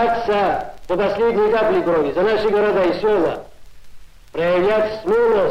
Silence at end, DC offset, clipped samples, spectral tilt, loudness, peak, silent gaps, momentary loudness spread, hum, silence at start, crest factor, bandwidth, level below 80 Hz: 0 s; under 0.1%; under 0.1%; -6.5 dB/octave; -18 LUFS; -8 dBFS; none; 7 LU; none; 0 s; 10 dB; 9.6 kHz; -44 dBFS